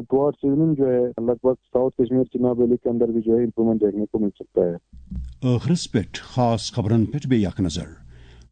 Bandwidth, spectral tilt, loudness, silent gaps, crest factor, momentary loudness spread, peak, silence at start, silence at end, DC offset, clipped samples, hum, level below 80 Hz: 9.4 kHz; -7.5 dB/octave; -22 LUFS; none; 14 dB; 6 LU; -6 dBFS; 0 s; 0.55 s; under 0.1%; under 0.1%; none; -44 dBFS